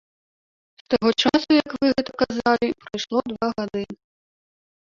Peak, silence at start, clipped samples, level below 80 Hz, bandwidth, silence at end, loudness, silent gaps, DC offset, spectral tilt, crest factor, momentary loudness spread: -4 dBFS; 0.9 s; under 0.1%; -56 dBFS; 7.6 kHz; 0.9 s; -22 LUFS; none; under 0.1%; -4.5 dB/octave; 20 dB; 11 LU